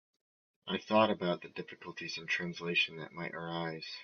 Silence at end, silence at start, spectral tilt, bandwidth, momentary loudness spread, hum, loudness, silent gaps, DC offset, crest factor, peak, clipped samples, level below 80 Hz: 0 s; 0.65 s; -2.5 dB/octave; 7 kHz; 15 LU; none; -34 LUFS; none; under 0.1%; 22 dB; -14 dBFS; under 0.1%; -78 dBFS